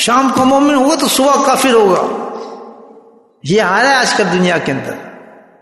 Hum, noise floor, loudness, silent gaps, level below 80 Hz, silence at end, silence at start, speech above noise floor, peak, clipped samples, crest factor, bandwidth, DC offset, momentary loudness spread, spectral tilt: none; -44 dBFS; -11 LUFS; none; -52 dBFS; 0.45 s; 0 s; 32 dB; 0 dBFS; under 0.1%; 12 dB; 12.5 kHz; under 0.1%; 17 LU; -3.5 dB/octave